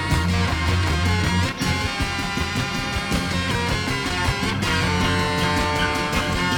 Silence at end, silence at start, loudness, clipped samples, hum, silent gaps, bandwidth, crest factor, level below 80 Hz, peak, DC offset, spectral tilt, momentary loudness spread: 0 s; 0 s; -22 LUFS; under 0.1%; none; none; 19 kHz; 14 dB; -32 dBFS; -8 dBFS; under 0.1%; -4.5 dB/octave; 3 LU